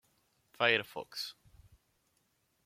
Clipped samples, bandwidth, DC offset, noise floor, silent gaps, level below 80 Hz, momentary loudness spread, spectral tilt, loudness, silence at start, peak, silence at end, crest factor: under 0.1%; 16.5 kHz; under 0.1%; -77 dBFS; none; -72 dBFS; 14 LU; -3 dB/octave; -33 LUFS; 0.6 s; -12 dBFS; 1.35 s; 26 dB